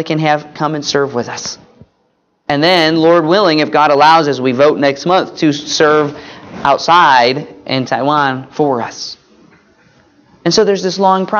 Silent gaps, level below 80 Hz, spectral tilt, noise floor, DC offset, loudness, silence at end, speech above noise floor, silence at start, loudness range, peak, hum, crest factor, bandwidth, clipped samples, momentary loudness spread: none; -56 dBFS; -4.5 dB/octave; -60 dBFS; under 0.1%; -12 LUFS; 0 s; 48 dB; 0 s; 6 LU; 0 dBFS; none; 12 dB; 9.4 kHz; under 0.1%; 13 LU